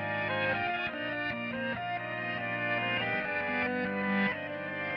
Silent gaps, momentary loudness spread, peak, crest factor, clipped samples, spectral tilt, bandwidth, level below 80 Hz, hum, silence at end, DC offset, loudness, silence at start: none; 5 LU; -18 dBFS; 16 dB; under 0.1%; -7.5 dB/octave; 6 kHz; -66 dBFS; none; 0 s; under 0.1%; -32 LUFS; 0 s